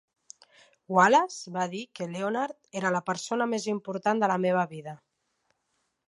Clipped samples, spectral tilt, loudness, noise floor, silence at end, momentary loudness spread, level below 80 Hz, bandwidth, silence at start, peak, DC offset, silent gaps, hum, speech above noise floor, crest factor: under 0.1%; -5 dB/octave; -27 LUFS; -77 dBFS; 1.1 s; 13 LU; -80 dBFS; 11.5 kHz; 0.9 s; -8 dBFS; under 0.1%; none; none; 50 dB; 20 dB